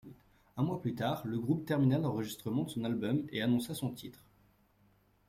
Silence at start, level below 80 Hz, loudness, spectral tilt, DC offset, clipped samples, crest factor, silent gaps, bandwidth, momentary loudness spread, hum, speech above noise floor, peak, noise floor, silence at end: 0.05 s; -66 dBFS; -34 LUFS; -6.5 dB/octave; under 0.1%; under 0.1%; 18 dB; none; 16 kHz; 9 LU; none; 35 dB; -18 dBFS; -69 dBFS; 1.15 s